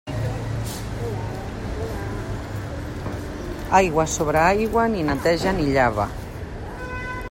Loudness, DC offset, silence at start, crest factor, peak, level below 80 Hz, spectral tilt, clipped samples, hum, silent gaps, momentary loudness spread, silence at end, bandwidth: -23 LUFS; under 0.1%; 0.05 s; 20 dB; -4 dBFS; -36 dBFS; -5.5 dB/octave; under 0.1%; none; none; 13 LU; 0 s; 16.5 kHz